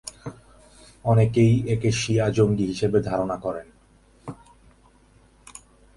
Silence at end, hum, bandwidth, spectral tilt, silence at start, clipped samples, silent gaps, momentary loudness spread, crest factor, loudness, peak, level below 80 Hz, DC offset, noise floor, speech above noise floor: 1.65 s; none; 11.5 kHz; -6.5 dB/octave; 0.05 s; under 0.1%; none; 22 LU; 18 dB; -22 LUFS; -6 dBFS; -48 dBFS; under 0.1%; -56 dBFS; 35 dB